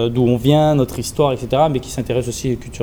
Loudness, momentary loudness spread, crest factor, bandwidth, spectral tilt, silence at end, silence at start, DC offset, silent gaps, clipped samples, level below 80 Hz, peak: -17 LUFS; 9 LU; 14 dB; over 20 kHz; -6.5 dB/octave; 0 s; 0 s; under 0.1%; none; under 0.1%; -38 dBFS; -2 dBFS